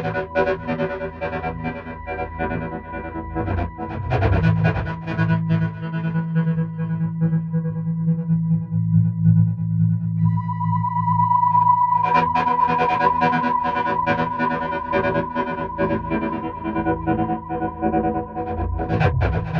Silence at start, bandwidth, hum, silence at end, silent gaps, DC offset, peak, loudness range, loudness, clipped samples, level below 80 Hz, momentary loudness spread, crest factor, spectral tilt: 0 s; 5.8 kHz; none; 0 s; none; under 0.1%; -4 dBFS; 6 LU; -21 LUFS; under 0.1%; -38 dBFS; 10 LU; 16 dB; -9.5 dB/octave